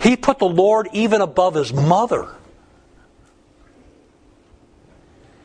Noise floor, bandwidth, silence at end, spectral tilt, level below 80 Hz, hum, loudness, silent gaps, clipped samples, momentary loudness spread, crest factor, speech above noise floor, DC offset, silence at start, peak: -53 dBFS; 10.5 kHz; 3.1 s; -6 dB/octave; -50 dBFS; none; -17 LUFS; none; under 0.1%; 6 LU; 20 dB; 36 dB; under 0.1%; 0 s; 0 dBFS